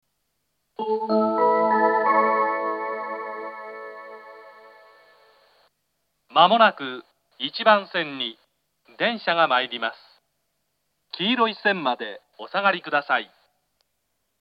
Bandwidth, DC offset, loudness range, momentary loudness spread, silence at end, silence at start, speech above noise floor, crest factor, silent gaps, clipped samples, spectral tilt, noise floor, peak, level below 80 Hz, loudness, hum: 5.6 kHz; under 0.1%; 7 LU; 19 LU; 1.15 s; 0.8 s; 53 dB; 24 dB; none; under 0.1%; -6.5 dB/octave; -75 dBFS; 0 dBFS; -86 dBFS; -22 LUFS; none